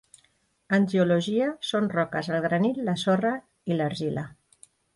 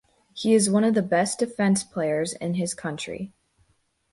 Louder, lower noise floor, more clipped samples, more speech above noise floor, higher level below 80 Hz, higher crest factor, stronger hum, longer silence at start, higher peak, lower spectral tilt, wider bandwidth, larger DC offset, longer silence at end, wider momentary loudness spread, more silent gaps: about the same, -26 LUFS vs -24 LUFS; about the same, -68 dBFS vs -68 dBFS; neither; about the same, 43 dB vs 45 dB; about the same, -66 dBFS vs -64 dBFS; about the same, 16 dB vs 16 dB; neither; first, 0.7 s vs 0.35 s; about the same, -10 dBFS vs -8 dBFS; first, -6.5 dB/octave vs -5 dB/octave; about the same, 11.5 kHz vs 11.5 kHz; neither; second, 0.6 s vs 0.85 s; second, 8 LU vs 13 LU; neither